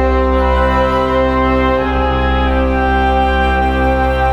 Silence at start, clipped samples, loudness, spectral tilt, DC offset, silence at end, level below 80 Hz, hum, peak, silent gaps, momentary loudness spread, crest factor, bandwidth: 0 s; under 0.1%; -14 LUFS; -7.5 dB/octave; under 0.1%; 0 s; -18 dBFS; none; -2 dBFS; none; 1 LU; 12 dB; 6.6 kHz